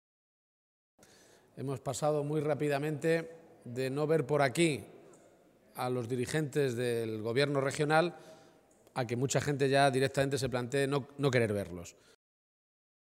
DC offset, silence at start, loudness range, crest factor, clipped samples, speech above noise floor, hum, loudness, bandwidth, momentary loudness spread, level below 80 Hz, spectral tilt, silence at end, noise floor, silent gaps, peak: under 0.1%; 1.55 s; 4 LU; 22 dB; under 0.1%; 31 dB; none; -32 LUFS; 16 kHz; 13 LU; -68 dBFS; -5.5 dB/octave; 1.2 s; -63 dBFS; none; -12 dBFS